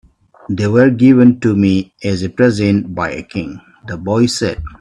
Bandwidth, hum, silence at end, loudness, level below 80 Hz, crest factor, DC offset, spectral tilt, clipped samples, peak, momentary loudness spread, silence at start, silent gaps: 11.5 kHz; none; 0.05 s; -14 LUFS; -42 dBFS; 14 dB; under 0.1%; -6.5 dB/octave; under 0.1%; 0 dBFS; 15 LU; 0.5 s; none